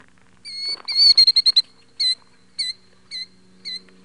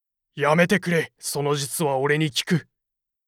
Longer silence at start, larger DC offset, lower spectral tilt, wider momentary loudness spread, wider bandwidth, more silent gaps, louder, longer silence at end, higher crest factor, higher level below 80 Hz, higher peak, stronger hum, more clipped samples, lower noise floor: about the same, 0.45 s vs 0.35 s; first, 0.2% vs under 0.1%; second, 2 dB/octave vs -4.5 dB/octave; first, 25 LU vs 7 LU; second, 11.5 kHz vs 17 kHz; neither; first, -15 LUFS vs -22 LUFS; second, 0.25 s vs 0.65 s; about the same, 16 dB vs 18 dB; about the same, -64 dBFS vs -64 dBFS; about the same, -4 dBFS vs -6 dBFS; neither; neither; second, -44 dBFS vs -83 dBFS